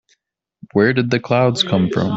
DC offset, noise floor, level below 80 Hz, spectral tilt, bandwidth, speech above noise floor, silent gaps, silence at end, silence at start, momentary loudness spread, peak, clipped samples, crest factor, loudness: under 0.1%; -66 dBFS; -52 dBFS; -6 dB/octave; 8 kHz; 50 dB; none; 0 s; 0.75 s; 3 LU; -2 dBFS; under 0.1%; 16 dB; -17 LUFS